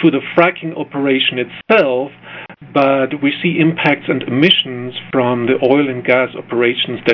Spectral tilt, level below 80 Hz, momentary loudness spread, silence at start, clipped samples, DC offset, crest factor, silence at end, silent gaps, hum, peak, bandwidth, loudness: -7.5 dB/octave; -58 dBFS; 10 LU; 0 s; under 0.1%; under 0.1%; 14 dB; 0 s; none; none; 0 dBFS; 5.4 kHz; -14 LUFS